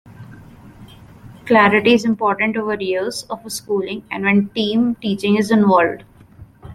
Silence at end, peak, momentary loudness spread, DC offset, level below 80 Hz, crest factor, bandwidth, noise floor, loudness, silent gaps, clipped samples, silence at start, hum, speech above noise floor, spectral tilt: 0 s; -2 dBFS; 13 LU; under 0.1%; -54 dBFS; 16 dB; 13.5 kHz; -43 dBFS; -17 LUFS; none; under 0.1%; 0.05 s; none; 27 dB; -5.5 dB/octave